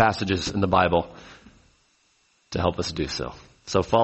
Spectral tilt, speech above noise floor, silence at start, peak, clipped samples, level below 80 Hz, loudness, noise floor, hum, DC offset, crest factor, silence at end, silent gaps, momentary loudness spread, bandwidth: -5 dB/octave; 42 dB; 0 s; -4 dBFS; under 0.1%; -46 dBFS; -25 LUFS; -65 dBFS; none; under 0.1%; 22 dB; 0 s; none; 16 LU; 8.2 kHz